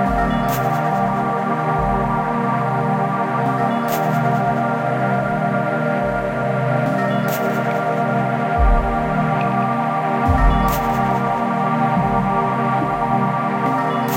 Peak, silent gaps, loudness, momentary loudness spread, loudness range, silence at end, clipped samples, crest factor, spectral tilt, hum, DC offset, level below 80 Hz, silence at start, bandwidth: -4 dBFS; none; -19 LUFS; 2 LU; 1 LU; 0 s; under 0.1%; 14 dB; -7.5 dB/octave; none; under 0.1%; -28 dBFS; 0 s; 16.5 kHz